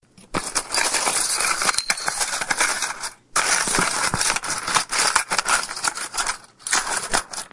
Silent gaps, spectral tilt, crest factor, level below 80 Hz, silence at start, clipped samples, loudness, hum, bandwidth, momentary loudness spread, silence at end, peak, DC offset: none; 0 dB/octave; 24 dB; -48 dBFS; 0.2 s; under 0.1%; -21 LUFS; none; 12 kHz; 6 LU; 0.05 s; 0 dBFS; under 0.1%